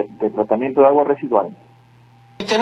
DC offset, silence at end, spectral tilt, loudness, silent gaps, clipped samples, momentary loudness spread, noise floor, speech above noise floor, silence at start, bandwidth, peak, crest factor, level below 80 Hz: under 0.1%; 0 s; -5 dB/octave; -17 LUFS; none; under 0.1%; 12 LU; -49 dBFS; 32 dB; 0 s; 10.5 kHz; 0 dBFS; 18 dB; -60 dBFS